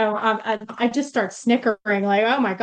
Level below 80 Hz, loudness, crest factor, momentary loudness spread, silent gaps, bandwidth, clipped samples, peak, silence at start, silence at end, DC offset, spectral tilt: -70 dBFS; -21 LUFS; 14 dB; 5 LU; none; 9.4 kHz; under 0.1%; -6 dBFS; 0 s; 0 s; under 0.1%; -5 dB/octave